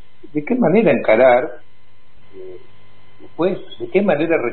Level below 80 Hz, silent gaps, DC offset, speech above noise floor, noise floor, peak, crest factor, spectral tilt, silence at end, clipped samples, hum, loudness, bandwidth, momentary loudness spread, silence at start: -58 dBFS; none; 3%; 38 dB; -55 dBFS; -2 dBFS; 16 dB; -12 dB/octave; 0 s; under 0.1%; 50 Hz at -55 dBFS; -16 LUFS; 4.3 kHz; 25 LU; 0.35 s